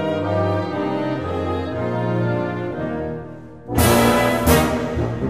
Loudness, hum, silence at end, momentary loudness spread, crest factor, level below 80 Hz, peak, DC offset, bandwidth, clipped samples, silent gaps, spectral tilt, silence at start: -20 LUFS; none; 0 s; 11 LU; 18 dB; -34 dBFS; -2 dBFS; 0.4%; 15.5 kHz; under 0.1%; none; -5.5 dB/octave; 0 s